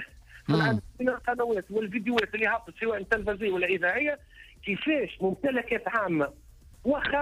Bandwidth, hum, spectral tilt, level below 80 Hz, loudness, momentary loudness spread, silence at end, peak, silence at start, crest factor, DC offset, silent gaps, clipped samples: 15.5 kHz; none; -6.5 dB/octave; -54 dBFS; -28 LUFS; 7 LU; 0 s; -14 dBFS; 0 s; 16 dB; under 0.1%; none; under 0.1%